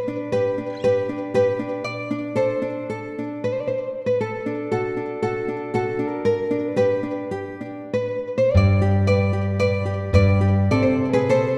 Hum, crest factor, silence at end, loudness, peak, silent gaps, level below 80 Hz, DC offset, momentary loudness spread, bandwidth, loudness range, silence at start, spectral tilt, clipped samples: none; 18 dB; 0 s; -22 LUFS; -2 dBFS; none; -42 dBFS; under 0.1%; 9 LU; 8.2 kHz; 6 LU; 0 s; -8 dB/octave; under 0.1%